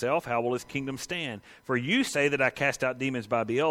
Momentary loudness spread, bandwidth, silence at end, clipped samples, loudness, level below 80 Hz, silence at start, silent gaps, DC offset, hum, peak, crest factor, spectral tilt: 8 LU; 16.5 kHz; 0 s; under 0.1%; -28 LUFS; -64 dBFS; 0 s; none; under 0.1%; none; -10 dBFS; 18 dB; -4.5 dB/octave